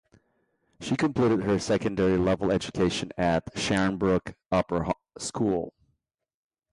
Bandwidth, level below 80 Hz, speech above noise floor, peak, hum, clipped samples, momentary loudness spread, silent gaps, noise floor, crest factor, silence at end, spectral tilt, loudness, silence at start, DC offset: 11.5 kHz; -50 dBFS; 59 dB; -12 dBFS; none; under 0.1%; 7 LU; none; -85 dBFS; 16 dB; 1.05 s; -5.5 dB/octave; -27 LUFS; 0.8 s; under 0.1%